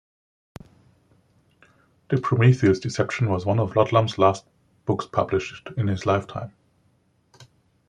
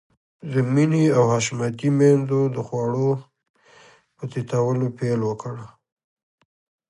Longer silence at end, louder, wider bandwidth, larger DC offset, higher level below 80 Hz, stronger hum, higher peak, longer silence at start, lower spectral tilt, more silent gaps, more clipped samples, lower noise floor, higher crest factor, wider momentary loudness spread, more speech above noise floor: second, 0.45 s vs 1.2 s; about the same, -23 LUFS vs -21 LUFS; second, 9.6 kHz vs 11 kHz; neither; first, -58 dBFS vs -64 dBFS; neither; about the same, -4 dBFS vs -4 dBFS; first, 2.1 s vs 0.45 s; about the same, -7 dB/octave vs -7 dB/octave; second, none vs 3.49-3.54 s; neither; first, -64 dBFS vs -52 dBFS; about the same, 22 dB vs 18 dB; about the same, 14 LU vs 14 LU; first, 43 dB vs 32 dB